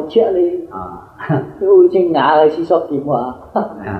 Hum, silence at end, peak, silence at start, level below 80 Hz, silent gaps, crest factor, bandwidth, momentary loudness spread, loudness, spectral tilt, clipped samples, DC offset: none; 0 s; -2 dBFS; 0 s; -50 dBFS; none; 14 dB; 4.8 kHz; 16 LU; -14 LUFS; -9 dB/octave; under 0.1%; under 0.1%